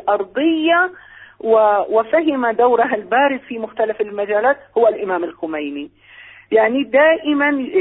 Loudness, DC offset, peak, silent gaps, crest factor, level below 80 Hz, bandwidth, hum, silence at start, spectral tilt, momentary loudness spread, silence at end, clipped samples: -17 LUFS; under 0.1%; -2 dBFS; none; 14 dB; -60 dBFS; 4 kHz; none; 0.05 s; -9.5 dB/octave; 11 LU; 0 s; under 0.1%